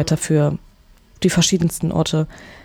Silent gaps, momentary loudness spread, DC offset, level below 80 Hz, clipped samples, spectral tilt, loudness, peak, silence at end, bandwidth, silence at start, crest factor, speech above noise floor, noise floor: none; 8 LU; under 0.1%; -42 dBFS; under 0.1%; -5 dB/octave; -19 LUFS; -4 dBFS; 0.05 s; 17 kHz; 0 s; 16 dB; 31 dB; -49 dBFS